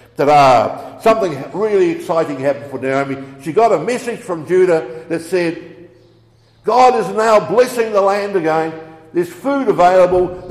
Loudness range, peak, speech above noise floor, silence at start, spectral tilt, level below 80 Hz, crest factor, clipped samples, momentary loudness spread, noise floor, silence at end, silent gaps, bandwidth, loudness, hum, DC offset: 3 LU; -2 dBFS; 36 dB; 0.2 s; -5.5 dB/octave; -50 dBFS; 14 dB; under 0.1%; 12 LU; -50 dBFS; 0 s; none; 14.5 kHz; -15 LUFS; none; under 0.1%